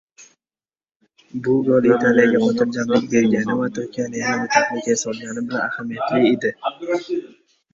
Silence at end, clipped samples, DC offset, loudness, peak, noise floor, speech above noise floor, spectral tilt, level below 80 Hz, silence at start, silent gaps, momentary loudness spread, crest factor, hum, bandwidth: 0.45 s; under 0.1%; under 0.1%; -19 LUFS; -2 dBFS; under -90 dBFS; over 71 dB; -5 dB/octave; -60 dBFS; 0.2 s; 0.96-1.00 s; 12 LU; 18 dB; none; 7.8 kHz